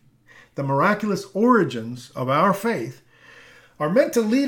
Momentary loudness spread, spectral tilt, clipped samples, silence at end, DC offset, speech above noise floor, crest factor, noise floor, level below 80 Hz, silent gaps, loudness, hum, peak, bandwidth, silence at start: 13 LU; -6 dB/octave; under 0.1%; 0 s; under 0.1%; 31 dB; 18 dB; -52 dBFS; -66 dBFS; none; -21 LUFS; none; -4 dBFS; 19 kHz; 0.55 s